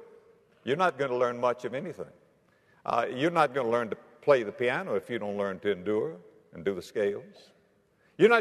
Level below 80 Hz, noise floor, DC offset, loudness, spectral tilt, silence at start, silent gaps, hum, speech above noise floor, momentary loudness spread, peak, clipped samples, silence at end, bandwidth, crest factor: -74 dBFS; -66 dBFS; under 0.1%; -29 LUFS; -6 dB/octave; 0 s; none; none; 37 dB; 14 LU; -8 dBFS; under 0.1%; 0 s; 13 kHz; 22 dB